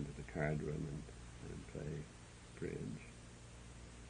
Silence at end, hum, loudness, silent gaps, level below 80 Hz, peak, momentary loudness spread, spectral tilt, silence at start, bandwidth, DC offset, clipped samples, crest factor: 0 s; none; -47 LUFS; none; -58 dBFS; -24 dBFS; 16 LU; -6.5 dB/octave; 0 s; 10 kHz; under 0.1%; under 0.1%; 22 dB